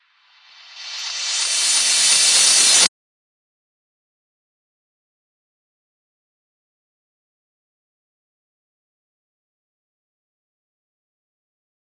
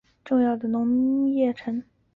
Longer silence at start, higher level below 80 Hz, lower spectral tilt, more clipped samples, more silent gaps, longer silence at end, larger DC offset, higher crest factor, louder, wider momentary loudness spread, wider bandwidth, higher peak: first, 0.75 s vs 0.25 s; second, -84 dBFS vs -62 dBFS; second, 3.5 dB/octave vs -9 dB/octave; neither; neither; first, 9.1 s vs 0.35 s; neither; first, 24 dB vs 12 dB; first, -13 LUFS vs -24 LUFS; first, 15 LU vs 9 LU; first, 12 kHz vs 4.3 kHz; first, 0 dBFS vs -12 dBFS